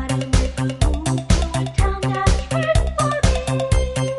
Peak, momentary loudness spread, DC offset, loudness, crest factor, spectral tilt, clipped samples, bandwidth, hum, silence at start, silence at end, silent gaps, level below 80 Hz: -2 dBFS; 2 LU; under 0.1%; -20 LUFS; 16 dB; -5.5 dB/octave; under 0.1%; 11.5 kHz; none; 0 s; 0 s; none; -22 dBFS